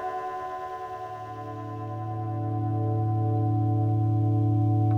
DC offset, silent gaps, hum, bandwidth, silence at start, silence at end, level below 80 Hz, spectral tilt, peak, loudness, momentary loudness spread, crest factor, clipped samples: under 0.1%; none; none; 3.3 kHz; 0 s; 0 s; -54 dBFS; -10.5 dB/octave; -14 dBFS; -28 LUFS; 12 LU; 12 dB; under 0.1%